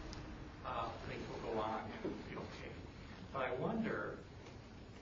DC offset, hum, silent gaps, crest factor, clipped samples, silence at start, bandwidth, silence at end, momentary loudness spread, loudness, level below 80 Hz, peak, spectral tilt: under 0.1%; none; none; 18 dB; under 0.1%; 0 s; 7.4 kHz; 0 s; 14 LU; -44 LUFS; -58 dBFS; -26 dBFS; -5 dB/octave